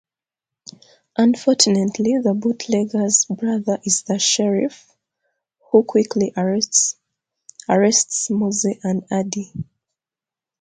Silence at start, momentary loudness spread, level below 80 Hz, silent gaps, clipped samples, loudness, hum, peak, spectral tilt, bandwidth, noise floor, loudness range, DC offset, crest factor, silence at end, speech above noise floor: 1.2 s; 11 LU; -64 dBFS; none; under 0.1%; -18 LUFS; none; -2 dBFS; -3.5 dB/octave; 9.6 kHz; -90 dBFS; 3 LU; under 0.1%; 20 dB; 0.95 s; 71 dB